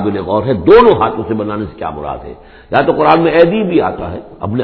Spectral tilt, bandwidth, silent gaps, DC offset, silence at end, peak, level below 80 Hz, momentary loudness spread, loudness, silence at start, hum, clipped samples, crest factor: -9.5 dB/octave; 5.4 kHz; none; under 0.1%; 0 s; 0 dBFS; -36 dBFS; 17 LU; -12 LUFS; 0 s; none; 0.5%; 12 dB